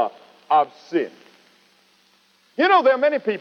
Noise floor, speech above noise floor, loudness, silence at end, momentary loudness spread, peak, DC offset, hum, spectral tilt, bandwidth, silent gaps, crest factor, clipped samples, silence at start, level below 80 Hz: -59 dBFS; 41 dB; -19 LUFS; 0 s; 12 LU; -6 dBFS; under 0.1%; none; -5 dB/octave; 6.6 kHz; none; 16 dB; under 0.1%; 0 s; -86 dBFS